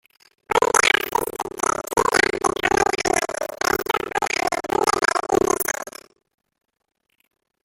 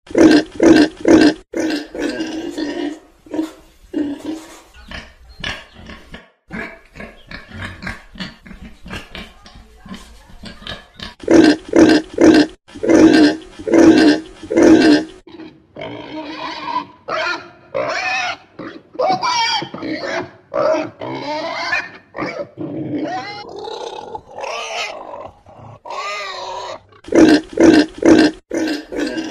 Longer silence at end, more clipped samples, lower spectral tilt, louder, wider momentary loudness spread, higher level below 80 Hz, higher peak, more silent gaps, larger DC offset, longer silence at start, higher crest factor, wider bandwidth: first, 1.75 s vs 0 s; neither; second, -2 dB/octave vs -4.5 dB/octave; second, -21 LUFS vs -15 LUFS; second, 7 LU vs 23 LU; about the same, -50 dBFS vs -46 dBFS; about the same, -2 dBFS vs 0 dBFS; neither; neither; first, 0.5 s vs 0.1 s; first, 22 dB vs 16 dB; first, 17 kHz vs 11 kHz